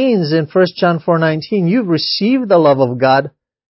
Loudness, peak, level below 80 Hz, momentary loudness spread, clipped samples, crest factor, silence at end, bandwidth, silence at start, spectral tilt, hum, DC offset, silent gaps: -14 LUFS; 0 dBFS; -60 dBFS; 4 LU; under 0.1%; 14 dB; 0.5 s; 5.8 kHz; 0 s; -9.5 dB/octave; none; under 0.1%; none